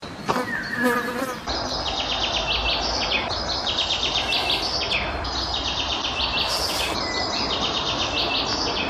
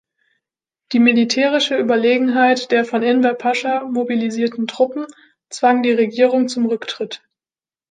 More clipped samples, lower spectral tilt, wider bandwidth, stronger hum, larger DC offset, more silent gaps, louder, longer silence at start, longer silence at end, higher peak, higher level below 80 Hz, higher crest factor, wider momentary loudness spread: neither; second, -2.5 dB/octave vs -4 dB/octave; first, 15 kHz vs 9.4 kHz; neither; neither; neither; second, -23 LUFS vs -17 LUFS; second, 0 s vs 0.9 s; second, 0 s vs 0.75 s; second, -6 dBFS vs -2 dBFS; first, -38 dBFS vs -72 dBFS; about the same, 18 dB vs 16 dB; second, 5 LU vs 10 LU